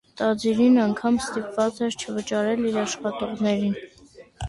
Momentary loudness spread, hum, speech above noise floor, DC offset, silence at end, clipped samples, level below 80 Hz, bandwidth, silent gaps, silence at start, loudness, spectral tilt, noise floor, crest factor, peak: 10 LU; none; 24 dB; under 0.1%; 0 s; under 0.1%; -50 dBFS; 11.5 kHz; none; 0.15 s; -24 LUFS; -5 dB/octave; -47 dBFS; 14 dB; -8 dBFS